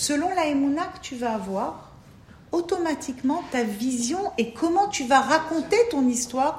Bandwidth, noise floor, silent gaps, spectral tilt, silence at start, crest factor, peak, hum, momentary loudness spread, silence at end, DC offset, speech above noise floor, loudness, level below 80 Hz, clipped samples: 16 kHz; -49 dBFS; none; -3.5 dB/octave; 0 s; 20 dB; -4 dBFS; none; 9 LU; 0 s; under 0.1%; 25 dB; -24 LUFS; -56 dBFS; under 0.1%